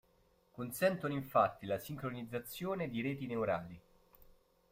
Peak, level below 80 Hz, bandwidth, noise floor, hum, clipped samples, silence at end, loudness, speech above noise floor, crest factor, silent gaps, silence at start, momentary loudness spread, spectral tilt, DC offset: -16 dBFS; -68 dBFS; 16 kHz; -71 dBFS; none; under 0.1%; 0.5 s; -37 LUFS; 34 dB; 22 dB; none; 0.55 s; 13 LU; -6 dB/octave; under 0.1%